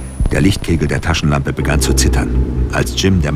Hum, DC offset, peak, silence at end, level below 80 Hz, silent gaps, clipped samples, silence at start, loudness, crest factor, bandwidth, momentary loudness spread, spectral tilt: none; under 0.1%; 0 dBFS; 0 s; -18 dBFS; none; under 0.1%; 0 s; -15 LUFS; 14 dB; 16 kHz; 4 LU; -5 dB/octave